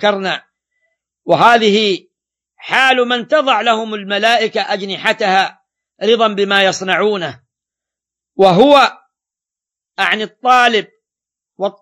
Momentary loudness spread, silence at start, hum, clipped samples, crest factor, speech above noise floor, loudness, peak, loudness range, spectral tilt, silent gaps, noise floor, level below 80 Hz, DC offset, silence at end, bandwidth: 13 LU; 0 s; none; 0.1%; 14 dB; 74 dB; -13 LUFS; 0 dBFS; 2 LU; -4 dB/octave; none; -87 dBFS; -62 dBFS; under 0.1%; 0.1 s; 15 kHz